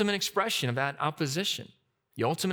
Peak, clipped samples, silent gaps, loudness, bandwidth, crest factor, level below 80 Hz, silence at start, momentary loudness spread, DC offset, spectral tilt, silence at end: -12 dBFS; under 0.1%; none; -30 LUFS; over 20 kHz; 18 dB; -74 dBFS; 0 s; 5 LU; under 0.1%; -4 dB/octave; 0 s